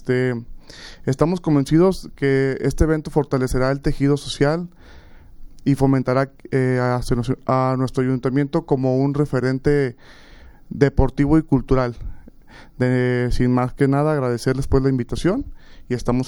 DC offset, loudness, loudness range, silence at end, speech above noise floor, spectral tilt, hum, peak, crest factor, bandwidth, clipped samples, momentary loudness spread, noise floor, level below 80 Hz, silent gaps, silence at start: under 0.1%; -20 LUFS; 2 LU; 0 s; 19 dB; -7.5 dB/octave; none; -2 dBFS; 18 dB; 12.5 kHz; under 0.1%; 9 LU; -38 dBFS; -32 dBFS; none; 0 s